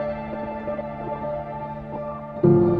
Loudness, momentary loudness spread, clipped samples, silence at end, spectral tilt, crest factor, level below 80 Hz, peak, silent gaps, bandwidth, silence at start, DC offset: -27 LUFS; 13 LU; under 0.1%; 0 s; -11.5 dB/octave; 18 dB; -46 dBFS; -6 dBFS; none; 4.7 kHz; 0 s; under 0.1%